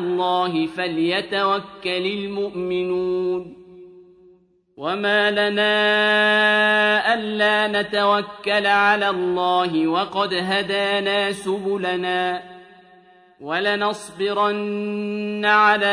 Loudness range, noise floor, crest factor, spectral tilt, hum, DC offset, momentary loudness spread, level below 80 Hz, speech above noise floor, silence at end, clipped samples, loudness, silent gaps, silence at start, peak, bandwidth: 7 LU; -55 dBFS; 18 dB; -4.5 dB/octave; none; under 0.1%; 10 LU; -64 dBFS; 35 dB; 0 s; under 0.1%; -20 LUFS; none; 0 s; -2 dBFS; 10.5 kHz